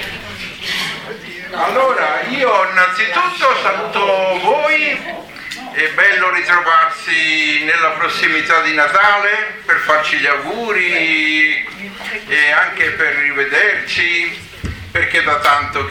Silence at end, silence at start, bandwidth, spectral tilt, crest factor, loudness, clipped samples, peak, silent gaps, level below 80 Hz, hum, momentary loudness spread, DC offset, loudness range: 0 s; 0 s; 19.5 kHz; -3 dB/octave; 16 dB; -13 LUFS; under 0.1%; 0 dBFS; none; -46 dBFS; none; 14 LU; under 0.1%; 3 LU